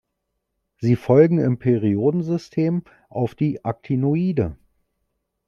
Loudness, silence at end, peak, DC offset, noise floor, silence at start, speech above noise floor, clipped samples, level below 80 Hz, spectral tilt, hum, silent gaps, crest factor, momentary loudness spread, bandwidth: -21 LUFS; 0.95 s; -2 dBFS; under 0.1%; -77 dBFS; 0.8 s; 57 dB; under 0.1%; -54 dBFS; -10 dB/octave; none; none; 18 dB; 12 LU; 7.2 kHz